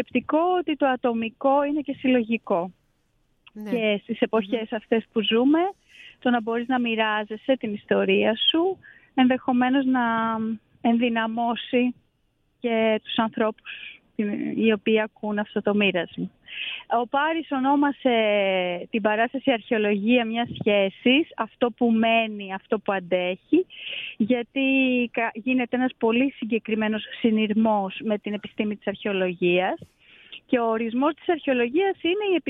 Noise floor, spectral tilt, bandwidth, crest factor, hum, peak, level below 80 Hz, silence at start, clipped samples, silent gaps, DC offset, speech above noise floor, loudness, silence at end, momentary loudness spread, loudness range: -69 dBFS; -8 dB/octave; 4 kHz; 18 dB; none; -6 dBFS; -66 dBFS; 0 s; under 0.1%; none; under 0.1%; 45 dB; -24 LUFS; 0 s; 8 LU; 3 LU